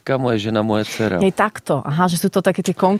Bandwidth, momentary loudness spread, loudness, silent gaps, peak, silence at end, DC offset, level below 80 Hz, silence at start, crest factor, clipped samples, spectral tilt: 15.5 kHz; 3 LU; -19 LUFS; none; -2 dBFS; 0 s; under 0.1%; -52 dBFS; 0.05 s; 16 dB; under 0.1%; -6 dB/octave